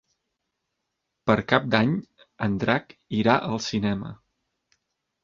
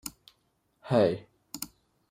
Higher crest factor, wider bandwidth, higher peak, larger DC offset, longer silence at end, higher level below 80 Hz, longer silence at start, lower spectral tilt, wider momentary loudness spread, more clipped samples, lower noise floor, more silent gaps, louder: about the same, 24 dB vs 22 dB; second, 7.6 kHz vs 16 kHz; first, -2 dBFS vs -10 dBFS; neither; first, 1.1 s vs 0.45 s; first, -56 dBFS vs -68 dBFS; first, 1.25 s vs 0.05 s; about the same, -6 dB/octave vs -5.5 dB/octave; second, 10 LU vs 17 LU; neither; first, -81 dBFS vs -73 dBFS; neither; first, -25 LUFS vs -29 LUFS